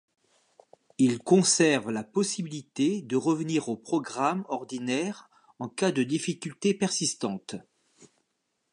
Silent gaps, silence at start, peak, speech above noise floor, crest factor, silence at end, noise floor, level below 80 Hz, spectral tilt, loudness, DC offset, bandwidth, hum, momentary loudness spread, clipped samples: none; 1 s; -8 dBFS; 51 dB; 20 dB; 0.65 s; -78 dBFS; -76 dBFS; -4 dB/octave; -27 LUFS; under 0.1%; 11.5 kHz; none; 14 LU; under 0.1%